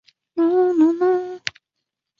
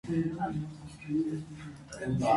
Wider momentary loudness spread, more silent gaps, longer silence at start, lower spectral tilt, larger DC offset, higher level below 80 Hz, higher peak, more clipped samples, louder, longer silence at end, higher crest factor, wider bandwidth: about the same, 14 LU vs 13 LU; neither; first, 0.35 s vs 0.05 s; second, -4.5 dB/octave vs -7 dB/octave; neither; second, -70 dBFS vs -56 dBFS; first, 0 dBFS vs -12 dBFS; neither; first, -19 LUFS vs -35 LUFS; first, 0.7 s vs 0 s; about the same, 20 dB vs 20 dB; second, 7.2 kHz vs 11.5 kHz